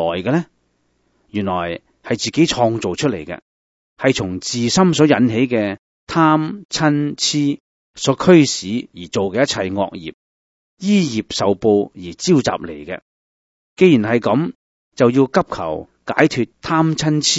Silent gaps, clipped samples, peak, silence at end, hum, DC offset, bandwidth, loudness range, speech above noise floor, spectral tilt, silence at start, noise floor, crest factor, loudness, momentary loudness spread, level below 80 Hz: 3.42-3.96 s, 5.79-6.07 s, 6.65-6.69 s, 7.60-7.94 s, 10.14-10.77 s, 13.02-13.76 s, 14.55-14.92 s; under 0.1%; 0 dBFS; 0 s; none; under 0.1%; 8 kHz; 4 LU; 48 dB; -5 dB/octave; 0 s; -64 dBFS; 18 dB; -17 LUFS; 15 LU; -52 dBFS